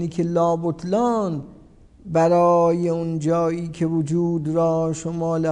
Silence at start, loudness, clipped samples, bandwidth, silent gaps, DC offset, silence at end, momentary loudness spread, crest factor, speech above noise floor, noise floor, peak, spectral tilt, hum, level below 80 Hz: 0 s; -21 LUFS; under 0.1%; 10 kHz; none; under 0.1%; 0 s; 8 LU; 14 dB; 28 dB; -48 dBFS; -8 dBFS; -8 dB/octave; none; -52 dBFS